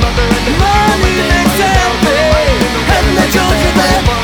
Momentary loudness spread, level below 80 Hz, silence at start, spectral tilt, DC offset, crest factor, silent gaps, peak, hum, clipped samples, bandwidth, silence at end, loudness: 2 LU; -18 dBFS; 0 s; -4.5 dB/octave; under 0.1%; 10 dB; none; 0 dBFS; none; under 0.1%; over 20 kHz; 0 s; -10 LUFS